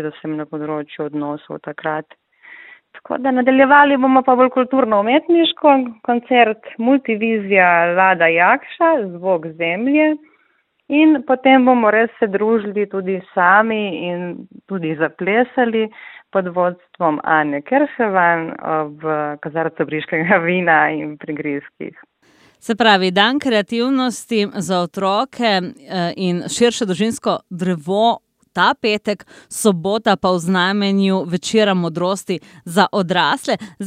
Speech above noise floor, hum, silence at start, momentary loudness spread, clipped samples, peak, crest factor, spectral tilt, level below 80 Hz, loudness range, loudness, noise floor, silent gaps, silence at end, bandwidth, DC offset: 45 dB; none; 0 s; 13 LU; under 0.1%; 0 dBFS; 16 dB; -5 dB/octave; -64 dBFS; 5 LU; -16 LUFS; -62 dBFS; none; 0 s; 15.5 kHz; under 0.1%